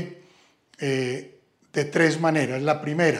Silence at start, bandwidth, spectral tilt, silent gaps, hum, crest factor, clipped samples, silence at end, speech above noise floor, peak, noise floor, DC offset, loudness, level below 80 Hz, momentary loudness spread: 0 s; 13.5 kHz; -5.5 dB/octave; none; none; 18 dB; under 0.1%; 0 s; 36 dB; -6 dBFS; -58 dBFS; under 0.1%; -24 LUFS; -74 dBFS; 11 LU